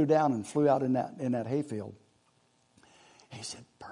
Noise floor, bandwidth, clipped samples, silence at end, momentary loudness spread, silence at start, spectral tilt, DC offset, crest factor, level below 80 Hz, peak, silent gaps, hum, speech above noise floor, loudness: -69 dBFS; 11 kHz; under 0.1%; 0 s; 18 LU; 0 s; -6.5 dB/octave; under 0.1%; 18 dB; -74 dBFS; -12 dBFS; none; none; 39 dB; -30 LUFS